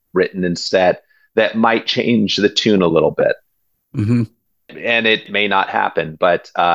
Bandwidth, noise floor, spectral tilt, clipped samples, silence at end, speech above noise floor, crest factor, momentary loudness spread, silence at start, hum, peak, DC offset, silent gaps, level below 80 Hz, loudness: 8.6 kHz; -66 dBFS; -5 dB/octave; under 0.1%; 0 s; 51 dB; 16 dB; 8 LU; 0.15 s; none; 0 dBFS; under 0.1%; none; -50 dBFS; -16 LUFS